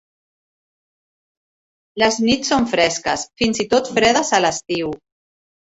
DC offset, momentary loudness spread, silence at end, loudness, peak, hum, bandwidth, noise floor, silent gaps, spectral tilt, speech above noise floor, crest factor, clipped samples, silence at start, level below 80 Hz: under 0.1%; 8 LU; 0.8 s; -18 LUFS; -2 dBFS; none; 8.4 kHz; under -90 dBFS; none; -3 dB/octave; over 72 dB; 20 dB; under 0.1%; 1.95 s; -52 dBFS